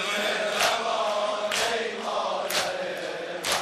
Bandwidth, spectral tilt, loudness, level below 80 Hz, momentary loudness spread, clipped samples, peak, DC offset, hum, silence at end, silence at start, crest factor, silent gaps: 14 kHz; -1 dB/octave; -26 LUFS; -64 dBFS; 7 LU; under 0.1%; -10 dBFS; under 0.1%; none; 0 s; 0 s; 18 dB; none